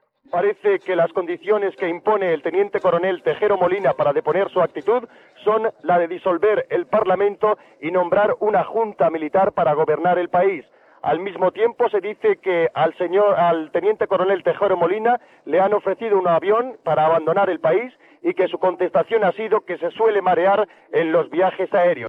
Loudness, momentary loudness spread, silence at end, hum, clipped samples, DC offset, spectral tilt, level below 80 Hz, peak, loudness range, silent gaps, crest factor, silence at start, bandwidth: -20 LUFS; 5 LU; 0 s; none; under 0.1%; under 0.1%; -8 dB/octave; -66 dBFS; -6 dBFS; 1 LU; none; 12 dB; 0.35 s; 4.9 kHz